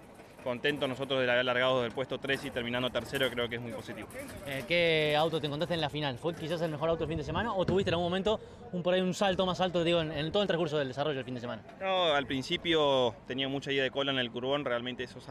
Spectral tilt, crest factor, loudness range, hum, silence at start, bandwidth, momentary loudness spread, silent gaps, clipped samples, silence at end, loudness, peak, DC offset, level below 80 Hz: -5 dB/octave; 16 dB; 2 LU; none; 0 s; 14.5 kHz; 11 LU; none; under 0.1%; 0 s; -31 LUFS; -16 dBFS; under 0.1%; -58 dBFS